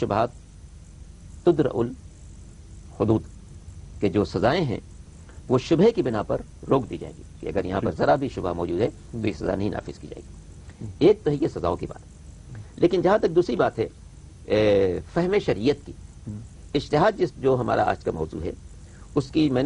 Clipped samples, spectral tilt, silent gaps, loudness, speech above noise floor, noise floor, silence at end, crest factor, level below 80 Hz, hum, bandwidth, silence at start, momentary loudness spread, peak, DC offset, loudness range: under 0.1%; -7 dB/octave; none; -24 LUFS; 21 dB; -44 dBFS; 0 s; 18 dB; -44 dBFS; none; 10.5 kHz; 0 s; 22 LU; -6 dBFS; under 0.1%; 4 LU